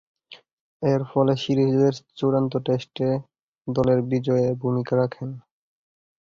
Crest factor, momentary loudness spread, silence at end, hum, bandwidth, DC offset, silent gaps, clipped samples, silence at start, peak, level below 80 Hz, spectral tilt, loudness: 16 dB; 8 LU; 0.9 s; none; 7.2 kHz; under 0.1%; 0.53-0.80 s, 3.41-3.53 s; under 0.1%; 0.3 s; -8 dBFS; -56 dBFS; -8 dB/octave; -23 LUFS